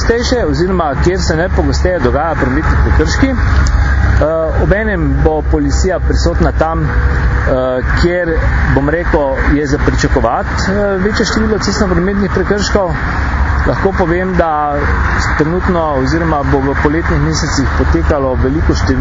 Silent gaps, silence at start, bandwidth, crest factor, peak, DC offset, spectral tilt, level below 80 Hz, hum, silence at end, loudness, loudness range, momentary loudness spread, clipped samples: none; 0 s; 7.6 kHz; 12 dB; 0 dBFS; under 0.1%; -6 dB/octave; -16 dBFS; none; 0 s; -13 LUFS; 1 LU; 2 LU; under 0.1%